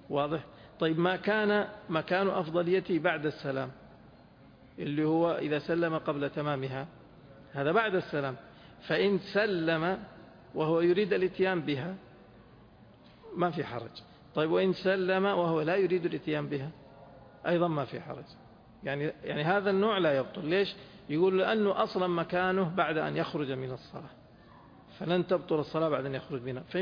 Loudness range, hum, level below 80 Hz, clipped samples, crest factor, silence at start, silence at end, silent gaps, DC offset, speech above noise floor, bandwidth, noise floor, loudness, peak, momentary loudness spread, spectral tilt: 5 LU; none; -66 dBFS; under 0.1%; 18 dB; 0.05 s; 0 s; none; under 0.1%; 26 dB; 5.2 kHz; -56 dBFS; -30 LUFS; -12 dBFS; 14 LU; -8 dB/octave